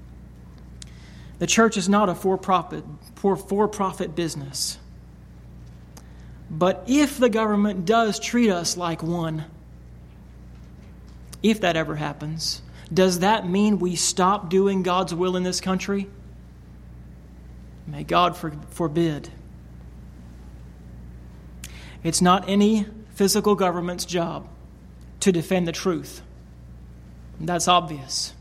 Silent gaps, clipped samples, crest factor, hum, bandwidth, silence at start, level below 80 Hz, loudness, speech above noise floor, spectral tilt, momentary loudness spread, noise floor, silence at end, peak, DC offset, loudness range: none; under 0.1%; 22 dB; 60 Hz at -45 dBFS; 16 kHz; 0 s; -46 dBFS; -22 LUFS; 22 dB; -4.5 dB/octave; 24 LU; -44 dBFS; 0 s; -2 dBFS; under 0.1%; 6 LU